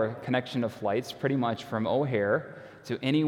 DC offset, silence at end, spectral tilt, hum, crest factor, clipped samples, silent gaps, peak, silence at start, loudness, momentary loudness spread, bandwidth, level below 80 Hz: under 0.1%; 0 s; -7 dB/octave; none; 16 dB; under 0.1%; none; -12 dBFS; 0 s; -29 LUFS; 6 LU; 17 kHz; -70 dBFS